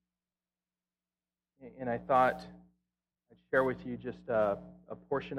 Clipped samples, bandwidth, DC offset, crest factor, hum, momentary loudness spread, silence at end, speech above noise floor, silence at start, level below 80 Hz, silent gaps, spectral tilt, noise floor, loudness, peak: under 0.1%; 13.5 kHz; under 0.1%; 22 dB; none; 18 LU; 0 s; over 57 dB; 1.6 s; -66 dBFS; none; -7.5 dB/octave; under -90 dBFS; -33 LUFS; -14 dBFS